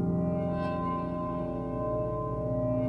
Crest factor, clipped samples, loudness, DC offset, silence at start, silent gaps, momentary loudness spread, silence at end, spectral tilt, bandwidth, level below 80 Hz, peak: 12 dB; under 0.1%; -32 LUFS; under 0.1%; 0 s; none; 3 LU; 0 s; -10.5 dB/octave; 5.6 kHz; -46 dBFS; -20 dBFS